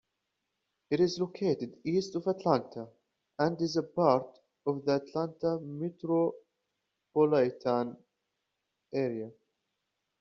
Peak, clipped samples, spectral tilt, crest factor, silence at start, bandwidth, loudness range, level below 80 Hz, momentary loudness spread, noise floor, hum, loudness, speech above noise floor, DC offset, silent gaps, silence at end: -10 dBFS; under 0.1%; -6 dB/octave; 22 dB; 0.9 s; 7.4 kHz; 2 LU; -72 dBFS; 12 LU; -84 dBFS; none; -31 LUFS; 54 dB; under 0.1%; none; 0.9 s